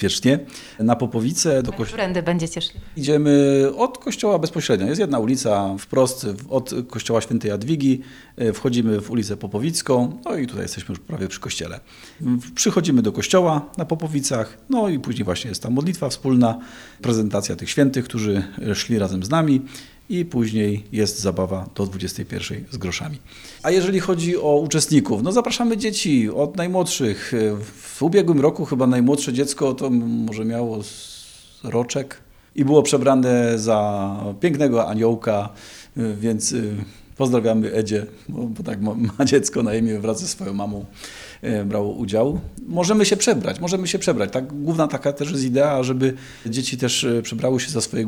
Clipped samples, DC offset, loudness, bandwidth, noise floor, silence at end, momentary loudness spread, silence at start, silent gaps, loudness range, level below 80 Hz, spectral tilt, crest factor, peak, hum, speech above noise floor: under 0.1%; under 0.1%; -21 LUFS; 19 kHz; -43 dBFS; 0 s; 11 LU; 0 s; none; 4 LU; -50 dBFS; -5 dB/octave; 20 dB; -2 dBFS; none; 23 dB